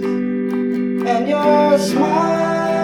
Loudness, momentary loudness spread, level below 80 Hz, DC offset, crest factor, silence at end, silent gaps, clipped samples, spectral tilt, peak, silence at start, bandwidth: -17 LUFS; 6 LU; -54 dBFS; under 0.1%; 14 dB; 0 s; none; under 0.1%; -6 dB/octave; -2 dBFS; 0 s; 15.5 kHz